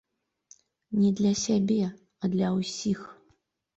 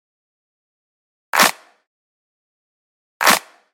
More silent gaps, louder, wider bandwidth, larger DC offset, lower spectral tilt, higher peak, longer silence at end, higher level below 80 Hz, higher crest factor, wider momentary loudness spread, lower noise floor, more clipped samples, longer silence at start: second, none vs 1.87-3.20 s; second, -27 LUFS vs -16 LUFS; second, 8 kHz vs 17 kHz; neither; first, -6 dB/octave vs -0.5 dB/octave; second, -14 dBFS vs 0 dBFS; first, 0.65 s vs 0.35 s; first, -64 dBFS vs -78 dBFS; second, 14 dB vs 22 dB; first, 10 LU vs 4 LU; second, -69 dBFS vs under -90 dBFS; neither; second, 0.9 s vs 1.35 s